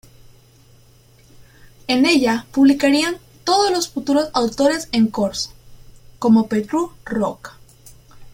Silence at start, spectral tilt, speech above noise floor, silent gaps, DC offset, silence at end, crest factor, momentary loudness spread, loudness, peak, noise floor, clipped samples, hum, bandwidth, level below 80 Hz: 1.9 s; -4 dB/octave; 33 dB; none; under 0.1%; 0.05 s; 16 dB; 11 LU; -18 LUFS; -4 dBFS; -50 dBFS; under 0.1%; none; 16.5 kHz; -50 dBFS